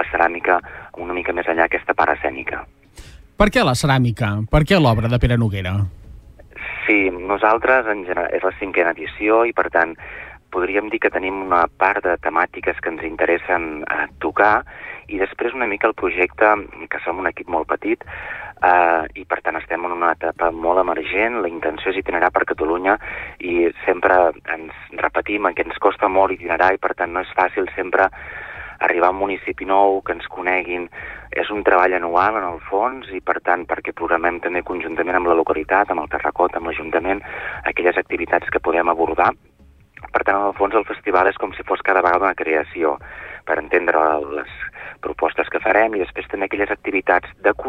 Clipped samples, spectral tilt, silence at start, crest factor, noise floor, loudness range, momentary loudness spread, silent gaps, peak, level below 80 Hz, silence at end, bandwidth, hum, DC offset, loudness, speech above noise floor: under 0.1%; -6.5 dB/octave; 0 s; 18 dB; -47 dBFS; 2 LU; 11 LU; none; -2 dBFS; -40 dBFS; 0 s; 14.5 kHz; none; under 0.1%; -19 LUFS; 28 dB